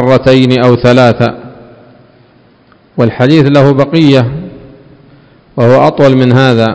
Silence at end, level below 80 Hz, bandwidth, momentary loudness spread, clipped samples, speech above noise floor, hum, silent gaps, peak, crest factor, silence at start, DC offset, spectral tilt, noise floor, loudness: 0 s; -40 dBFS; 8 kHz; 15 LU; 6%; 38 dB; none; none; 0 dBFS; 8 dB; 0 s; under 0.1%; -7.5 dB/octave; -44 dBFS; -7 LUFS